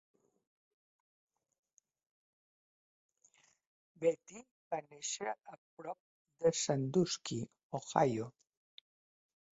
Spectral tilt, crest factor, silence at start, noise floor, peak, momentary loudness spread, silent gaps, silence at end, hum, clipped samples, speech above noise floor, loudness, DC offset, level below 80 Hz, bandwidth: -5 dB/octave; 28 dB; 4 s; -71 dBFS; -12 dBFS; 17 LU; 4.51-4.71 s, 5.58-5.77 s, 6.00-6.25 s, 7.63-7.70 s; 1.25 s; none; under 0.1%; 34 dB; -37 LUFS; under 0.1%; -78 dBFS; 8 kHz